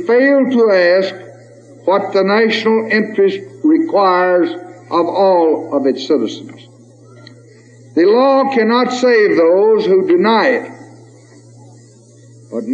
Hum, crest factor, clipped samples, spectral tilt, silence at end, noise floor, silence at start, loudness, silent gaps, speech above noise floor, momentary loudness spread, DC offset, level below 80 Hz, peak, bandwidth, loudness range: none; 12 dB; under 0.1%; -6 dB/octave; 0 s; -42 dBFS; 0 s; -13 LUFS; none; 30 dB; 10 LU; under 0.1%; -78 dBFS; -2 dBFS; 8.6 kHz; 4 LU